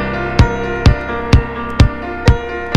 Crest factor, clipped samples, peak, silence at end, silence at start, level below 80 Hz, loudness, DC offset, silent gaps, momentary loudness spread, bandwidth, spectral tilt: 14 dB; 0.3%; 0 dBFS; 0 s; 0 s; -18 dBFS; -15 LUFS; under 0.1%; none; 4 LU; 10 kHz; -6.5 dB/octave